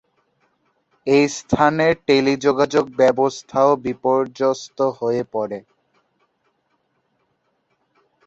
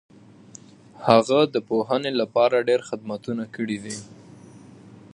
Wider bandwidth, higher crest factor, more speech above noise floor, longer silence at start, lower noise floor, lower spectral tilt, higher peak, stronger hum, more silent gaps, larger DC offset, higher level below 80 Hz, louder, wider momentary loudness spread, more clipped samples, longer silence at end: second, 8 kHz vs 11.5 kHz; second, 18 dB vs 24 dB; first, 50 dB vs 25 dB; about the same, 1.05 s vs 1 s; first, -68 dBFS vs -47 dBFS; about the same, -5 dB/octave vs -5 dB/octave; about the same, -2 dBFS vs 0 dBFS; neither; neither; neither; first, -54 dBFS vs -66 dBFS; first, -19 LUFS vs -22 LUFS; second, 7 LU vs 13 LU; neither; first, 2.65 s vs 0.25 s